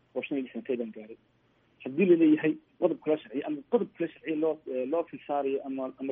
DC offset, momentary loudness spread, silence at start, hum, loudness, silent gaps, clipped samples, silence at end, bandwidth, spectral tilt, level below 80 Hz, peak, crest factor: under 0.1%; 13 LU; 0.15 s; none; -30 LUFS; none; under 0.1%; 0 s; 3.8 kHz; -6 dB/octave; -78 dBFS; -12 dBFS; 18 dB